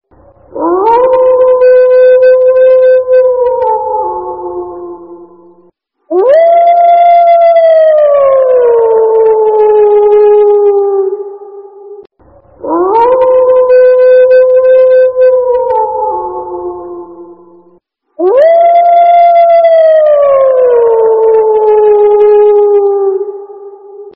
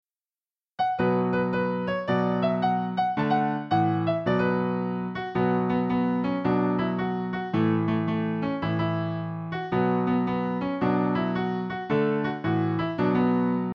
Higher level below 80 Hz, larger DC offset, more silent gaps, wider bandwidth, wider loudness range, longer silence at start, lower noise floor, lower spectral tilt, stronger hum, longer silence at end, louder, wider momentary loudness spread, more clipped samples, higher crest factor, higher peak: first, -50 dBFS vs -58 dBFS; first, 0.2% vs under 0.1%; neither; second, 4.9 kHz vs 5.8 kHz; first, 6 LU vs 2 LU; second, 0.55 s vs 0.8 s; second, -48 dBFS vs under -90 dBFS; second, -7.5 dB/octave vs -9.5 dB/octave; neither; about the same, 0.05 s vs 0 s; first, -6 LUFS vs -26 LUFS; first, 14 LU vs 5 LU; neither; second, 6 dB vs 14 dB; first, 0 dBFS vs -12 dBFS